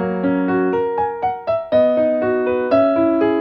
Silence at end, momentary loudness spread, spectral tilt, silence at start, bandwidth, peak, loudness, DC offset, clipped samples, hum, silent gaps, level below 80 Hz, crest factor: 0 s; 5 LU; -9.5 dB/octave; 0 s; 5.6 kHz; -4 dBFS; -17 LUFS; under 0.1%; under 0.1%; none; none; -54 dBFS; 14 dB